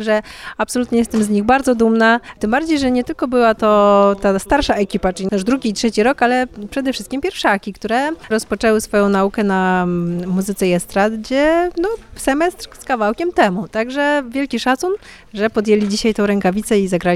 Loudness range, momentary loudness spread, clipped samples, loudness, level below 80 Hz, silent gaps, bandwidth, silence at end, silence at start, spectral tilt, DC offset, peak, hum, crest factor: 4 LU; 8 LU; under 0.1%; -16 LUFS; -40 dBFS; none; 15.5 kHz; 0 s; 0 s; -5 dB/octave; under 0.1%; -2 dBFS; none; 14 dB